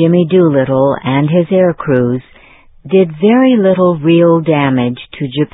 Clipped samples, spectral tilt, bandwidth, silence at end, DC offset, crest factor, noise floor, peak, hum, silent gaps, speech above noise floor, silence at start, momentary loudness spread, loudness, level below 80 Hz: under 0.1%; -12 dB/octave; 4 kHz; 0.05 s; under 0.1%; 10 dB; -41 dBFS; 0 dBFS; none; none; 31 dB; 0 s; 8 LU; -11 LUFS; -48 dBFS